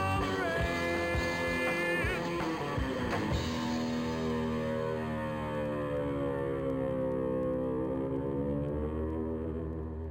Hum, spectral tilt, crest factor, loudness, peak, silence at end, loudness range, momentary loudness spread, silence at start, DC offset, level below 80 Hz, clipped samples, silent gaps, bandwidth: none; -6 dB/octave; 14 dB; -33 LUFS; -20 dBFS; 0 s; 2 LU; 4 LU; 0 s; under 0.1%; -46 dBFS; under 0.1%; none; 16 kHz